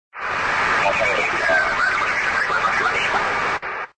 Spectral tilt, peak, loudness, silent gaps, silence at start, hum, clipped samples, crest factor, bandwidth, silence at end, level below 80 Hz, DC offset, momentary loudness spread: -2.5 dB/octave; -6 dBFS; -19 LUFS; none; 0.15 s; none; under 0.1%; 14 dB; 9.4 kHz; 0.1 s; -48 dBFS; under 0.1%; 5 LU